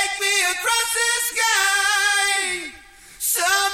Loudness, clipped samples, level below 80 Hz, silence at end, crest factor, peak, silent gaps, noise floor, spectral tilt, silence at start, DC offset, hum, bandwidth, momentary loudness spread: -18 LUFS; under 0.1%; -56 dBFS; 0 s; 16 dB; -6 dBFS; none; -44 dBFS; 2.5 dB/octave; 0 s; under 0.1%; none; 16.5 kHz; 8 LU